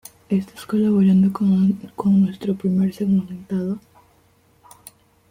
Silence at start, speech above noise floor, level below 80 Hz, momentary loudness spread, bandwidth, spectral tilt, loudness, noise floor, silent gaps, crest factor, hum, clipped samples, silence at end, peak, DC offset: 0.3 s; 39 dB; -58 dBFS; 10 LU; 15.5 kHz; -9 dB/octave; -20 LUFS; -57 dBFS; none; 12 dB; none; under 0.1%; 1.55 s; -8 dBFS; under 0.1%